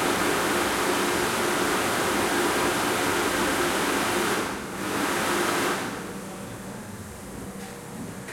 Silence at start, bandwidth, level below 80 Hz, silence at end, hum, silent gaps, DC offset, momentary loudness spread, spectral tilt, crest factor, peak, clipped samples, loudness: 0 s; 16.5 kHz; -52 dBFS; 0 s; none; none; under 0.1%; 14 LU; -3 dB/octave; 16 dB; -12 dBFS; under 0.1%; -24 LUFS